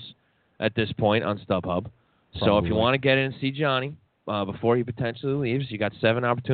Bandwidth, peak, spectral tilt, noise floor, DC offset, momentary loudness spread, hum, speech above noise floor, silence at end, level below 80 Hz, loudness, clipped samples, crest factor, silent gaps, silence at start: 4.7 kHz; -6 dBFS; -4.5 dB/octave; -59 dBFS; under 0.1%; 9 LU; none; 34 dB; 0 s; -52 dBFS; -25 LUFS; under 0.1%; 18 dB; none; 0 s